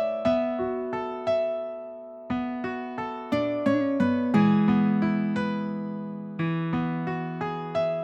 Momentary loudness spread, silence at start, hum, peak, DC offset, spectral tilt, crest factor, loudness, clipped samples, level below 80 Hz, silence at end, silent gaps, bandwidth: 11 LU; 0 s; none; -10 dBFS; under 0.1%; -8.5 dB/octave; 16 dB; -27 LUFS; under 0.1%; -58 dBFS; 0 s; none; 7.2 kHz